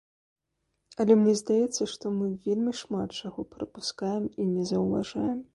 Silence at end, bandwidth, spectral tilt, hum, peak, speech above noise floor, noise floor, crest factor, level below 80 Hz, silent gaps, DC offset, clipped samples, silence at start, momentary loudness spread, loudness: 0.1 s; 11.5 kHz; -6 dB/octave; none; -10 dBFS; 52 dB; -79 dBFS; 20 dB; -62 dBFS; none; under 0.1%; under 0.1%; 1 s; 14 LU; -28 LUFS